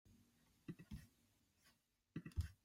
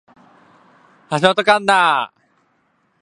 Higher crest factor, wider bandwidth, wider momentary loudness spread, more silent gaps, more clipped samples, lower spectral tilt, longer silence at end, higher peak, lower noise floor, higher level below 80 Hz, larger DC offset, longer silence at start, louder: about the same, 22 dB vs 20 dB; first, 16 kHz vs 11.5 kHz; about the same, 10 LU vs 11 LU; neither; neither; first, -6.5 dB/octave vs -4 dB/octave; second, 0.1 s vs 0.95 s; second, -32 dBFS vs 0 dBFS; first, -79 dBFS vs -63 dBFS; first, -60 dBFS vs -66 dBFS; neither; second, 0.05 s vs 1.1 s; second, -55 LUFS vs -15 LUFS